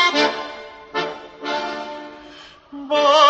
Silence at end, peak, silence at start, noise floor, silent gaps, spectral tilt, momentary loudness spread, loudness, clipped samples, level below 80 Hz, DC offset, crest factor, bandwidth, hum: 0 s; -2 dBFS; 0 s; -43 dBFS; none; -2 dB/octave; 22 LU; -22 LUFS; under 0.1%; -62 dBFS; under 0.1%; 18 dB; 8.2 kHz; none